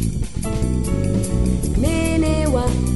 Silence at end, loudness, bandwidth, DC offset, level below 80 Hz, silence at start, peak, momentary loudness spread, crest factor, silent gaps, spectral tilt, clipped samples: 0 s; -20 LUFS; 12 kHz; 2%; -24 dBFS; 0 s; -6 dBFS; 5 LU; 12 dB; none; -6.5 dB/octave; under 0.1%